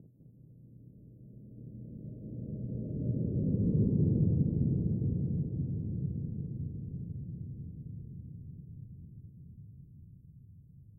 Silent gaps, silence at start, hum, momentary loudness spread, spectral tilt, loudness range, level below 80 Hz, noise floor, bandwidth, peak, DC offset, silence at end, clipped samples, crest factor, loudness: none; 0 s; none; 26 LU; -16 dB/octave; 16 LU; -50 dBFS; -57 dBFS; 1 kHz; -18 dBFS; under 0.1%; 0 s; under 0.1%; 18 dB; -34 LUFS